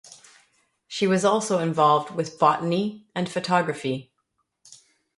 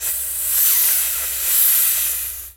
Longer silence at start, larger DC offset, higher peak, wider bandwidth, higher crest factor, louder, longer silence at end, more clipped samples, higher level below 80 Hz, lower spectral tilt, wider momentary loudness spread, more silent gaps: about the same, 0.1 s vs 0 s; neither; about the same, -4 dBFS vs -2 dBFS; second, 11.5 kHz vs over 20 kHz; about the same, 20 dB vs 16 dB; second, -23 LUFS vs -15 LUFS; first, 1.15 s vs 0.05 s; neither; second, -70 dBFS vs -48 dBFS; first, -5 dB/octave vs 2.5 dB/octave; first, 10 LU vs 7 LU; neither